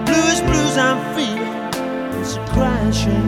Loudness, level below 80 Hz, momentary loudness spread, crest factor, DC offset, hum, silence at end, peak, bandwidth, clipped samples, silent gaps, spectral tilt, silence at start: -18 LUFS; -30 dBFS; 8 LU; 16 dB; under 0.1%; none; 0 s; -2 dBFS; 17.5 kHz; under 0.1%; none; -4.5 dB/octave; 0 s